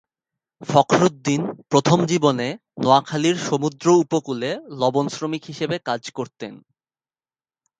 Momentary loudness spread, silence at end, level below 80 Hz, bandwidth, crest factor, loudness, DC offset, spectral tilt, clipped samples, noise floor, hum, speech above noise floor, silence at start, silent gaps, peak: 11 LU; 1.25 s; -64 dBFS; 9.4 kHz; 22 dB; -20 LUFS; under 0.1%; -5.5 dB/octave; under 0.1%; under -90 dBFS; none; over 70 dB; 0.6 s; none; 0 dBFS